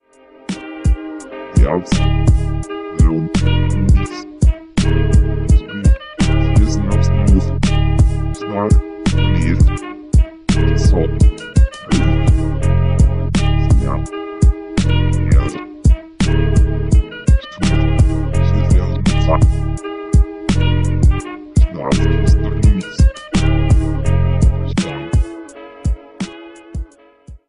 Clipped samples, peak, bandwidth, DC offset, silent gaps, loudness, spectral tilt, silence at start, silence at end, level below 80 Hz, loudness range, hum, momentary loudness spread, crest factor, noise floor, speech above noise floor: under 0.1%; 0 dBFS; 11 kHz; 3%; none; -16 LUFS; -7 dB/octave; 0 s; 0 s; -16 dBFS; 2 LU; none; 10 LU; 14 dB; -40 dBFS; 26 dB